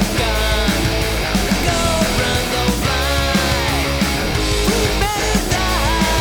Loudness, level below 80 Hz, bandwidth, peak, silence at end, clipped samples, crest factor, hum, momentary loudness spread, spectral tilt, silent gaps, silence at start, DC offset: -17 LUFS; -24 dBFS; over 20 kHz; -2 dBFS; 0 s; under 0.1%; 14 dB; none; 2 LU; -4 dB/octave; none; 0 s; under 0.1%